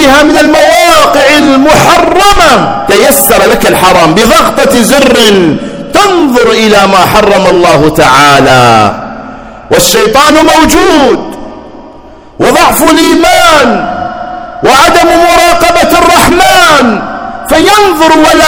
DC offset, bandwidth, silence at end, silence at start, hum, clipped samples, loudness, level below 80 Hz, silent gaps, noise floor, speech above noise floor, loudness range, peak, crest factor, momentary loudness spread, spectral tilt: under 0.1%; over 20 kHz; 0 s; 0 s; none; 20%; -4 LUFS; -26 dBFS; none; -30 dBFS; 26 dB; 3 LU; 0 dBFS; 4 dB; 8 LU; -3.5 dB/octave